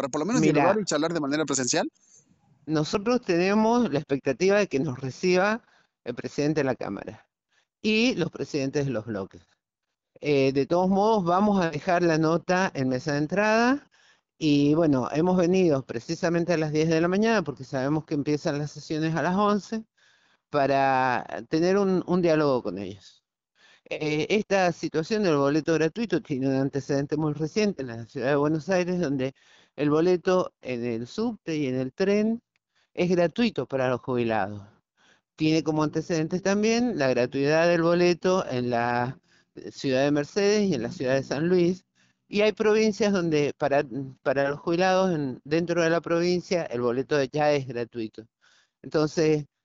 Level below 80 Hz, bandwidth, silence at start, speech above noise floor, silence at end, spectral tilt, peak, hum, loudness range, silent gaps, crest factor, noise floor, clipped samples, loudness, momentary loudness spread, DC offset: -60 dBFS; 8.2 kHz; 0 s; 61 dB; 0.2 s; -5.5 dB/octave; -6 dBFS; none; 4 LU; none; 18 dB; -85 dBFS; under 0.1%; -25 LUFS; 10 LU; under 0.1%